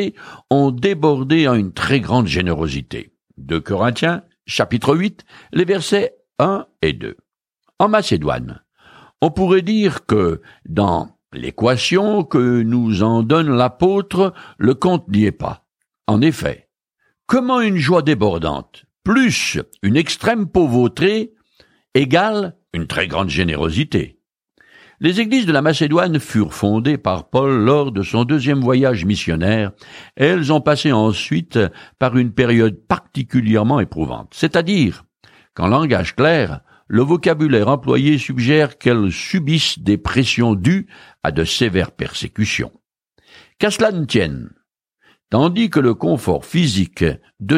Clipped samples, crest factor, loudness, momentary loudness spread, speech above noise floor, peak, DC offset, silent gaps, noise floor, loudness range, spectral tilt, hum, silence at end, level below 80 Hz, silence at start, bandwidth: under 0.1%; 16 dB; -17 LUFS; 9 LU; 51 dB; -2 dBFS; under 0.1%; none; -67 dBFS; 4 LU; -6 dB/octave; none; 0 s; -42 dBFS; 0 s; 15.5 kHz